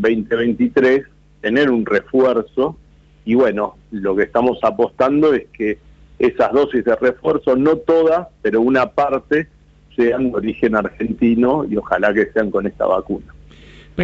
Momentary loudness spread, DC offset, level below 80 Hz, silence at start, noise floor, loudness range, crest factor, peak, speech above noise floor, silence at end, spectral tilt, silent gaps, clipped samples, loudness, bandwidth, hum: 8 LU; under 0.1%; -46 dBFS; 0 s; -42 dBFS; 2 LU; 16 dB; -2 dBFS; 26 dB; 0 s; -7.5 dB/octave; none; under 0.1%; -17 LUFS; 7.6 kHz; none